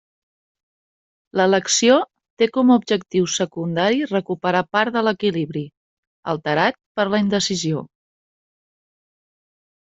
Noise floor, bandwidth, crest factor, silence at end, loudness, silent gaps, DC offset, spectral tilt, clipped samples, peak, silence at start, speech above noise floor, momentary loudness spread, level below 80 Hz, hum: under -90 dBFS; 8.2 kHz; 18 dB; 2 s; -19 LUFS; 2.30-2.37 s, 5.77-6.23 s, 6.86-6.95 s; under 0.1%; -4 dB/octave; under 0.1%; -2 dBFS; 1.35 s; over 71 dB; 11 LU; -62 dBFS; none